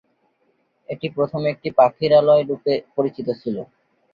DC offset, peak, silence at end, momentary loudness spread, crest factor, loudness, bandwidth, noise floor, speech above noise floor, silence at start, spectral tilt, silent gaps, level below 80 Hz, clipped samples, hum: under 0.1%; -2 dBFS; 0.5 s; 14 LU; 18 dB; -20 LUFS; 5.2 kHz; -66 dBFS; 47 dB; 0.9 s; -8.5 dB/octave; none; -62 dBFS; under 0.1%; none